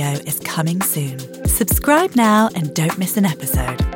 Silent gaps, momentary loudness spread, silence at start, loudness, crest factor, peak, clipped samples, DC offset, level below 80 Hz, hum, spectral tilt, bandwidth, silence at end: none; 8 LU; 0 s; -17 LUFS; 16 dB; -2 dBFS; under 0.1%; under 0.1%; -30 dBFS; none; -5 dB/octave; 17 kHz; 0 s